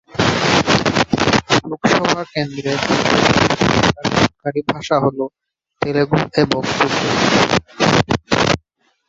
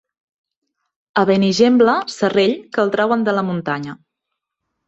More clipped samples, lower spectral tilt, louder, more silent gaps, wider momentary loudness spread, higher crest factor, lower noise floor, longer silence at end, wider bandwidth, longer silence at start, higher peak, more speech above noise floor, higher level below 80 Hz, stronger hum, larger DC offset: neither; about the same, -4.5 dB/octave vs -5.5 dB/octave; about the same, -16 LUFS vs -17 LUFS; neither; second, 7 LU vs 10 LU; about the same, 16 dB vs 16 dB; second, -59 dBFS vs -79 dBFS; second, 0.5 s vs 0.95 s; about the same, 8 kHz vs 8.2 kHz; second, 0.15 s vs 1.15 s; about the same, 0 dBFS vs -2 dBFS; second, 43 dB vs 63 dB; first, -40 dBFS vs -60 dBFS; neither; neither